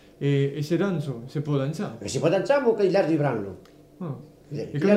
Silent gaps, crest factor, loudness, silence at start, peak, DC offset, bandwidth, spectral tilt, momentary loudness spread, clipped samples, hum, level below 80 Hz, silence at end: none; 18 dB; -25 LUFS; 0.2 s; -6 dBFS; under 0.1%; 12.5 kHz; -7 dB/octave; 16 LU; under 0.1%; none; -62 dBFS; 0 s